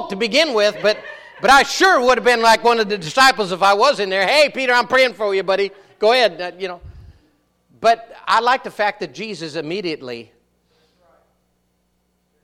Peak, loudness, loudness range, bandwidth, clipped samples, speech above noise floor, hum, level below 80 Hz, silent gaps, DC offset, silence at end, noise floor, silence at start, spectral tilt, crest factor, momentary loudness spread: -2 dBFS; -16 LUFS; 11 LU; 16.5 kHz; under 0.1%; 49 dB; 60 Hz at -60 dBFS; -52 dBFS; none; under 0.1%; 2.2 s; -66 dBFS; 0 s; -2.5 dB/octave; 16 dB; 14 LU